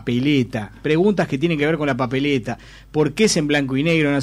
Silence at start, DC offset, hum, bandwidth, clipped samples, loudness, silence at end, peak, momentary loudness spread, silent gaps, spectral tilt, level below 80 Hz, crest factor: 0 s; under 0.1%; none; 13.5 kHz; under 0.1%; -19 LUFS; 0 s; -6 dBFS; 9 LU; none; -5.5 dB/octave; -46 dBFS; 14 dB